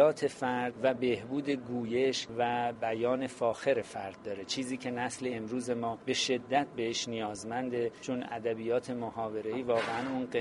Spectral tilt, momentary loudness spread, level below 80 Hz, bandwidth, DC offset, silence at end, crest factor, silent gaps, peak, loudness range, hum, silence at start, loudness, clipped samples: -4 dB/octave; 6 LU; -70 dBFS; 11.5 kHz; under 0.1%; 0 s; 20 dB; none; -12 dBFS; 2 LU; none; 0 s; -33 LUFS; under 0.1%